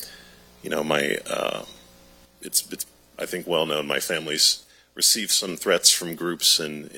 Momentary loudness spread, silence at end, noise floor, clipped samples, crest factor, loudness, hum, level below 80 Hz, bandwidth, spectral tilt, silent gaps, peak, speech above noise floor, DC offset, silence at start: 17 LU; 0 s; -53 dBFS; under 0.1%; 24 dB; -22 LUFS; none; -62 dBFS; 17.5 kHz; -1 dB/octave; none; -2 dBFS; 29 dB; under 0.1%; 0 s